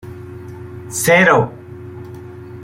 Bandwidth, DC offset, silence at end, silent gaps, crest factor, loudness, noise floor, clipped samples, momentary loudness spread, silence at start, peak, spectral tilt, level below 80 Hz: 16.5 kHz; under 0.1%; 0 s; none; 18 dB; -14 LUFS; -33 dBFS; under 0.1%; 24 LU; 0.05 s; -2 dBFS; -4.5 dB/octave; -52 dBFS